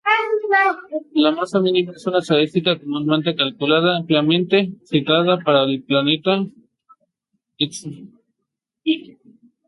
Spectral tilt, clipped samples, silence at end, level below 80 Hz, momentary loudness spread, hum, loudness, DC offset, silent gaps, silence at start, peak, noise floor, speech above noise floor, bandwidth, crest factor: -5.5 dB/octave; under 0.1%; 0.65 s; -66 dBFS; 7 LU; none; -18 LUFS; under 0.1%; none; 0.05 s; -2 dBFS; -79 dBFS; 61 dB; 11.5 kHz; 18 dB